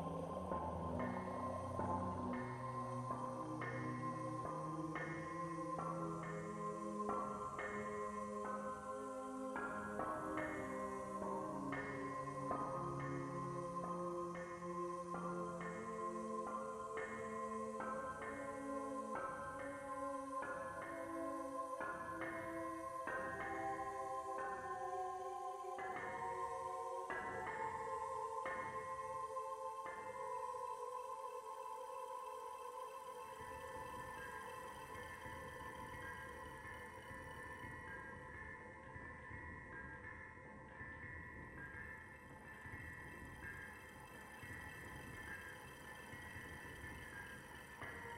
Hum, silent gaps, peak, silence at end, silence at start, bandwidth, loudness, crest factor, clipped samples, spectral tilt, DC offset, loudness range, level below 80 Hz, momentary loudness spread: none; none; -28 dBFS; 0 s; 0 s; 16 kHz; -47 LUFS; 18 dB; under 0.1%; -6 dB/octave; under 0.1%; 8 LU; -68 dBFS; 8 LU